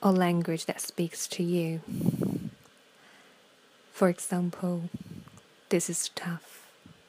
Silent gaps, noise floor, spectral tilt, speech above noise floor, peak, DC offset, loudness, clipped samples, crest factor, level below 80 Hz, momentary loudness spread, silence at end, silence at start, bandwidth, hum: none; -60 dBFS; -5 dB/octave; 31 dB; -10 dBFS; under 0.1%; -30 LUFS; under 0.1%; 22 dB; -70 dBFS; 17 LU; 0.15 s; 0 s; 15.5 kHz; none